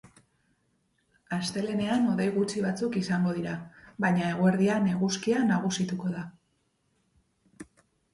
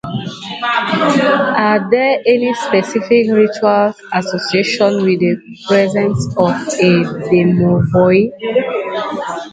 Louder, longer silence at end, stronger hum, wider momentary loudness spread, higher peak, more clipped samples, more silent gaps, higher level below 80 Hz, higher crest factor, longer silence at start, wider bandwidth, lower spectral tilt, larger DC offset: second, -28 LUFS vs -14 LUFS; first, 0.5 s vs 0.05 s; neither; about the same, 10 LU vs 8 LU; second, -12 dBFS vs 0 dBFS; neither; neither; second, -66 dBFS vs -48 dBFS; about the same, 16 dB vs 14 dB; first, 1.3 s vs 0.05 s; first, 11.5 kHz vs 9.2 kHz; about the same, -6 dB/octave vs -6 dB/octave; neither